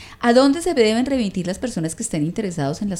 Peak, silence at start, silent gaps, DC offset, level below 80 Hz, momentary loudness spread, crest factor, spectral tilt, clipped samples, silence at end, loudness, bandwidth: -2 dBFS; 0 s; none; under 0.1%; -46 dBFS; 10 LU; 18 dB; -5 dB/octave; under 0.1%; 0 s; -20 LUFS; 14.5 kHz